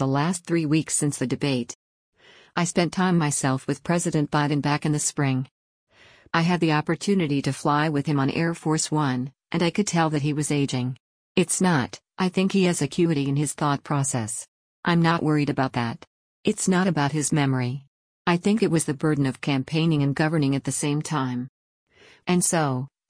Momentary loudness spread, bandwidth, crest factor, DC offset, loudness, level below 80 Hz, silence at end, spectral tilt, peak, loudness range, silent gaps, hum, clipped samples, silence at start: 8 LU; 10.5 kHz; 16 dB; under 0.1%; -24 LUFS; -60 dBFS; 0.25 s; -5 dB/octave; -8 dBFS; 1 LU; 1.75-2.12 s, 5.51-5.87 s, 11.00-11.35 s, 14.48-14.83 s, 16.07-16.43 s, 17.87-18.25 s, 21.49-21.87 s; none; under 0.1%; 0 s